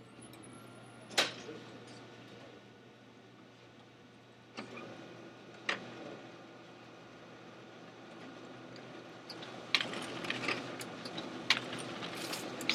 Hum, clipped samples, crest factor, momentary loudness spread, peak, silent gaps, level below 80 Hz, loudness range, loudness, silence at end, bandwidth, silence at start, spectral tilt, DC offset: none; under 0.1%; 34 dB; 24 LU; -8 dBFS; none; -82 dBFS; 16 LU; -39 LUFS; 0 s; 15.5 kHz; 0 s; -2.5 dB/octave; under 0.1%